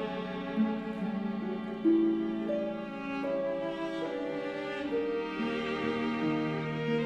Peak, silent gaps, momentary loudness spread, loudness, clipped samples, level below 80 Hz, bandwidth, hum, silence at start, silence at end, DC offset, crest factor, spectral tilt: -16 dBFS; none; 7 LU; -33 LUFS; under 0.1%; -62 dBFS; 8.4 kHz; none; 0 s; 0 s; under 0.1%; 16 dB; -7.5 dB/octave